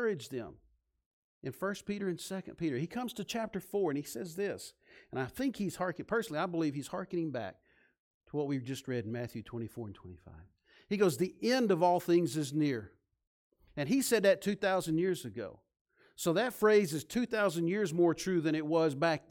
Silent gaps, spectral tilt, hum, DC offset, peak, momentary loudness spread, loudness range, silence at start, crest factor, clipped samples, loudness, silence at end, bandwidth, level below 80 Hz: 1.06-1.41 s, 7.99-8.21 s, 13.27-13.51 s, 15.81-15.85 s; -5.5 dB/octave; none; under 0.1%; -16 dBFS; 15 LU; 8 LU; 0 s; 18 dB; under 0.1%; -33 LUFS; 0.1 s; 17.5 kHz; -68 dBFS